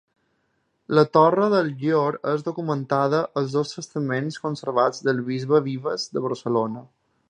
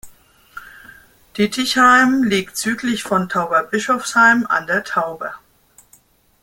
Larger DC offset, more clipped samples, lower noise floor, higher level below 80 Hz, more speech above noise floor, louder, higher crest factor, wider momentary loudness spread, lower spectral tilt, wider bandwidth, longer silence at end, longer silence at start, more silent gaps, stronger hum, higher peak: neither; neither; first, -71 dBFS vs -54 dBFS; second, -70 dBFS vs -56 dBFS; first, 48 dB vs 37 dB; second, -23 LUFS vs -16 LUFS; about the same, 20 dB vs 18 dB; second, 10 LU vs 18 LU; first, -6.5 dB/octave vs -3.5 dB/octave; second, 9.6 kHz vs 17 kHz; second, 0.45 s vs 1.05 s; first, 0.9 s vs 0.05 s; neither; neither; about the same, -2 dBFS vs 0 dBFS